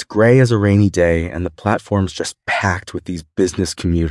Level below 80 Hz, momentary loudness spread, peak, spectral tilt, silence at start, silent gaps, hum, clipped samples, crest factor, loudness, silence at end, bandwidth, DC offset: -40 dBFS; 12 LU; 0 dBFS; -6.5 dB/octave; 0 s; none; none; under 0.1%; 16 dB; -17 LUFS; 0 s; 12 kHz; under 0.1%